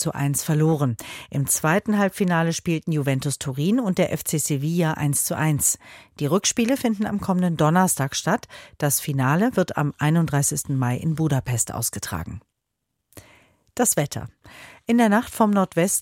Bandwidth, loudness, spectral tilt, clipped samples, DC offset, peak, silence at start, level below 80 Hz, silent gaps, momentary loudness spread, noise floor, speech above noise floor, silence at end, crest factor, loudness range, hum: 17 kHz; -22 LUFS; -5 dB/octave; under 0.1%; under 0.1%; -6 dBFS; 0 s; -52 dBFS; none; 9 LU; -79 dBFS; 57 dB; 0 s; 18 dB; 4 LU; none